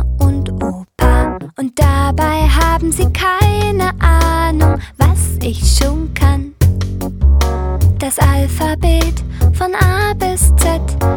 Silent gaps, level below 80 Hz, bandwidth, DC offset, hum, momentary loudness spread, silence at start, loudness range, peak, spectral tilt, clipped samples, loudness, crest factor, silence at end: none; -16 dBFS; 19 kHz; under 0.1%; none; 5 LU; 0 s; 2 LU; 0 dBFS; -5.5 dB/octave; under 0.1%; -14 LUFS; 12 dB; 0 s